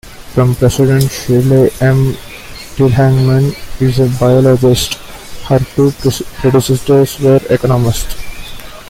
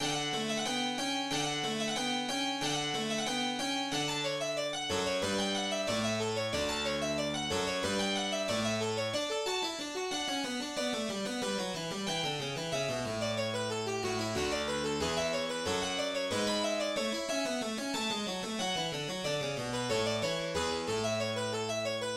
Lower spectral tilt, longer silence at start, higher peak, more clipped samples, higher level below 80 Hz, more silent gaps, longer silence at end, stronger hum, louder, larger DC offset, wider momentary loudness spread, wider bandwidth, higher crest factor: first, -6.5 dB/octave vs -3 dB/octave; about the same, 0.05 s vs 0 s; first, 0 dBFS vs -20 dBFS; neither; first, -30 dBFS vs -60 dBFS; neither; about the same, 0 s vs 0 s; neither; first, -11 LUFS vs -33 LUFS; neither; first, 17 LU vs 3 LU; about the same, 16.5 kHz vs 16 kHz; about the same, 12 dB vs 14 dB